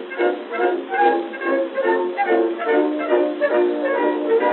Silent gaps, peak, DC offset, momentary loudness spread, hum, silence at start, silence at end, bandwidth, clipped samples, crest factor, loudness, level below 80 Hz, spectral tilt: none; -4 dBFS; under 0.1%; 4 LU; none; 0 s; 0 s; 4.3 kHz; under 0.1%; 14 dB; -20 LUFS; under -90 dBFS; -8 dB/octave